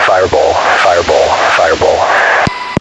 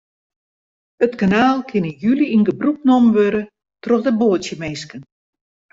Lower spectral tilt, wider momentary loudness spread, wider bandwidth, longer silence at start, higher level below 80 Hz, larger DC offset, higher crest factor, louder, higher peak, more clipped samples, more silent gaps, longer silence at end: second, -3.5 dB/octave vs -6.5 dB/octave; second, 2 LU vs 13 LU; first, 12 kHz vs 7.8 kHz; second, 0 s vs 1 s; first, -38 dBFS vs -56 dBFS; neither; second, 10 dB vs 16 dB; first, -9 LUFS vs -17 LUFS; about the same, 0 dBFS vs -2 dBFS; first, 0.3% vs under 0.1%; neither; second, 0 s vs 0.7 s